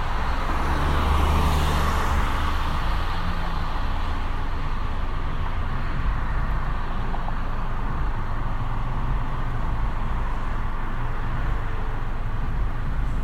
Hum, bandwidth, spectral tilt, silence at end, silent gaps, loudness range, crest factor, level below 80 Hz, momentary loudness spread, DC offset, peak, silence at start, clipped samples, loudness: none; 12.5 kHz; -6 dB/octave; 0 s; none; 5 LU; 14 dB; -24 dBFS; 8 LU; under 0.1%; -10 dBFS; 0 s; under 0.1%; -28 LUFS